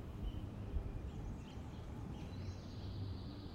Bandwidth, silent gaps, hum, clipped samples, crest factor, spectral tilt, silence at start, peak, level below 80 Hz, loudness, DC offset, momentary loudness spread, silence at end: 15.5 kHz; none; none; under 0.1%; 16 dB; -7.5 dB/octave; 0 s; -30 dBFS; -50 dBFS; -48 LUFS; under 0.1%; 4 LU; 0 s